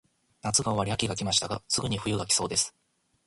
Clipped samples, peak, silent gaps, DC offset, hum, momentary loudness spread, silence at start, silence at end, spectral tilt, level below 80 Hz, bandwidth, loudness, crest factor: under 0.1%; -8 dBFS; none; under 0.1%; none; 5 LU; 0.45 s; 0.55 s; -3 dB/octave; -54 dBFS; 11.5 kHz; -27 LUFS; 20 dB